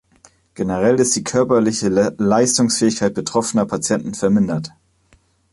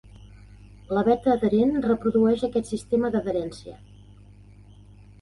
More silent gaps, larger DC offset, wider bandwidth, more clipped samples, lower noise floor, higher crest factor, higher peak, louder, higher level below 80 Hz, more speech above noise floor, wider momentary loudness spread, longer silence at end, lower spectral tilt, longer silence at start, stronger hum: neither; neither; about the same, 11.5 kHz vs 11.5 kHz; neither; first, -57 dBFS vs -49 dBFS; about the same, 16 dB vs 18 dB; first, -2 dBFS vs -8 dBFS; first, -17 LUFS vs -23 LUFS; about the same, -50 dBFS vs -50 dBFS; first, 40 dB vs 26 dB; second, 6 LU vs 9 LU; second, 0.85 s vs 1.45 s; second, -4.5 dB/octave vs -7.5 dB/octave; second, 0.6 s vs 0.9 s; second, none vs 50 Hz at -45 dBFS